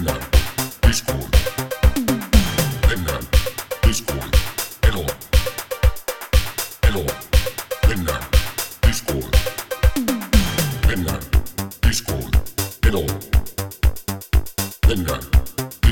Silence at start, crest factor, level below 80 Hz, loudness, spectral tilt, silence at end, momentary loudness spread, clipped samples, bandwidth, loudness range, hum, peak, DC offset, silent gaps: 0 s; 18 dB; -20 dBFS; -21 LUFS; -4.5 dB/octave; 0 s; 6 LU; under 0.1%; over 20 kHz; 2 LU; none; 0 dBFS; 0.2%; none